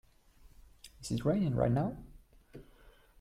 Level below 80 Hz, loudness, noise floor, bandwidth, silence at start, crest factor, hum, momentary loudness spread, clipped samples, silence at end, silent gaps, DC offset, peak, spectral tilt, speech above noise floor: -54 dBFS; -33 LUFS; -61 dBFS; 14.5 kHz; 0.85 s; 18 dB; none; 26 LU; under 0.1%; 0.6 s; none; under 0.1%; -18 dBFS; -7.5 dB/octave; 29 dB